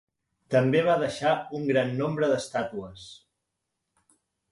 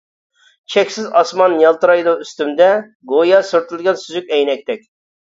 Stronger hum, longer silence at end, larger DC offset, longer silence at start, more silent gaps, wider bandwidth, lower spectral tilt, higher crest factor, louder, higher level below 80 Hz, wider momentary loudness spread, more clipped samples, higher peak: neither; first, 1.35 s vs 0.5 s; neither; second, 0.5 s vs 0.7 s; second, none vs 2.95-3.00 s; first, 11.5 kHz vs 7.8 kHz; first, -6 dB/octave vs -4 dB/octave; about the same, 18 dB vs 14 dB; second, -26 LUFS vs -15 LUFS; about the same, -64 dBFS vs -68 dBFS; first, 17 LU vs 9 LU; neither; second, -10 dBFS vs 0 dBFS